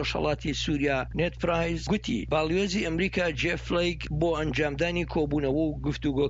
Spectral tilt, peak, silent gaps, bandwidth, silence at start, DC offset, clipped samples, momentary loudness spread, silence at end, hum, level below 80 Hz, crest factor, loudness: -5.5 dB/octave; -14 dBFS; none; 8 kHz; 0 s; under 0.1%; under 0.1%; 2 LU; 0 s; none; -40 dBFS; 14 dB; -28 LUFS